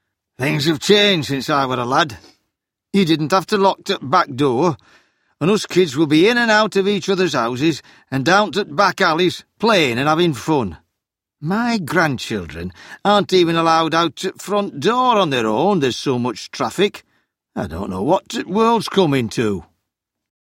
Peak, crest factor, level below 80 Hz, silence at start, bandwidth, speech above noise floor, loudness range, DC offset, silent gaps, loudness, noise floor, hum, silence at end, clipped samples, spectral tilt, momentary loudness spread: 0 dBFS; 18 dB; -52 dBFS; 0.4 s; 16.5 kHz; 63 dB; 4 LU; under 0.1%; none; -17 LUFS; -80 dBFS; none; 0.8 s; under 0.1%; -5 dB/octave; 10 LU